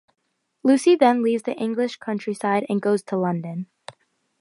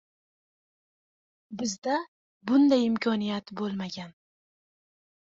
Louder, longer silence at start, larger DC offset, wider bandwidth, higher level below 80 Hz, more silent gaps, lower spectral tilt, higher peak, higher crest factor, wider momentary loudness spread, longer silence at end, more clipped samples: first, -22 LUFS vs -27 LUFS; second, 0.65 s vs 1.5 s; neither; first, 11.5 kHz vs 7.8 kHz; second, -76 dBFS vs -70 dBFS; second, none vs 1.78-1.82 s, 2.08-2.40 s; about the same, -6 dB/octave vs -5 dB/octave; first, -4 dBFS vs -12 dBFS; about the same, 18 dB vs 18 dB; second, 12 LU vs 20 LU; second, 0.5 s vs 1.15 s; neither